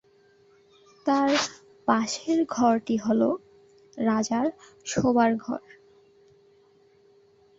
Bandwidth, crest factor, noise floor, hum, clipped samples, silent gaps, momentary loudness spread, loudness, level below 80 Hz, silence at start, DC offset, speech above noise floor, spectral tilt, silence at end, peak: 8 kHz; 22 dB; -60 dBFS; none; under 0.1%; none; 10 LU; -25 LUFS; -62 dBFS; 1.05 s; under 0.1%; 35 dB; -4.5 dB/octave; 2 s; -6 dBFS